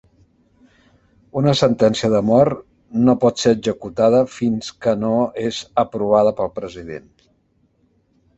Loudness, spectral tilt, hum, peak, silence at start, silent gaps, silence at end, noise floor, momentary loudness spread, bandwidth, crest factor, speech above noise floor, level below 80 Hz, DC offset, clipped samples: -18 LUFS; -6 dB/octave; none; -2 dBFS; 1.35 s; none; 1.4 s; -62 dBFS; 13 LU; 8.2 kHz; 18 dB; 45 dB; -52 dBFS; under 0.1%; under 0.1%